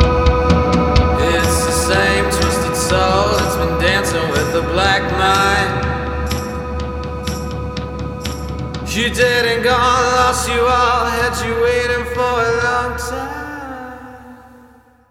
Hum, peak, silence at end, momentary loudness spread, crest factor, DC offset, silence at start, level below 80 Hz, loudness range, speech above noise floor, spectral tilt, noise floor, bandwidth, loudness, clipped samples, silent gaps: none; 0 dBFS; 0.65 s; 11 LU; 16 dB; under 0.1%; 0 s; -26 dBFS; 6 LU; 31 dB; -4.5 dB/octave; -47 dBFS; 16.5 kHz; -16 LUFS; under 0.1%; none